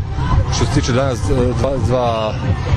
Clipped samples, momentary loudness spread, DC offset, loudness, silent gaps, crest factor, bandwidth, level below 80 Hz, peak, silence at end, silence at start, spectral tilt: under 0.1%; 3 LU; under 0.1%; -17 LUFS; none; 12 dB; 11 kHz; -24 dBFS; -4 dBFS; 0 s; 0 s; -6 dB/octave